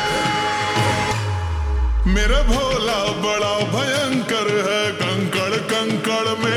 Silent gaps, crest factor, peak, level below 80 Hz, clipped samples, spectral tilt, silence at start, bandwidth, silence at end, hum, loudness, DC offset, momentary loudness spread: none; 14 dB; -6 dBFS; -26 dBFS; under 0.1%; -4.5 dB/octave; 0 s; 18.5 kHz; 0 s; none; -20 LUFS; under 0.1%; 3 LU